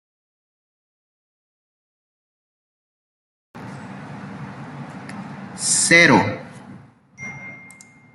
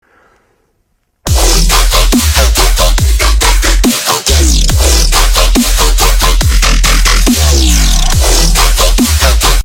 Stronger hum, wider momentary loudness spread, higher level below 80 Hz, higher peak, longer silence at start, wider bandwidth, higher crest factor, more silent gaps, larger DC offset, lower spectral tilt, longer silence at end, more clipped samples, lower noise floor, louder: neither; first, 26 LU vs 2 LU; second, -62 dBFS vs -10 dBFS; about the same, -2 dBFS vs 0 dBFS; first, 3.55 s vs 1.25 s; second, 12.5 kHz vs 17.5 kHz; first, 24 dB vs 8 dB; neither; neither; about the same, -3 dB/octave vs -3 dB/octave; first, 0.6 s vs 0 s; second, under 0.1% vs 0.2%; second, -46 dBFS vs -59 dBFS; second, -14 LUFS vs -9 LUFS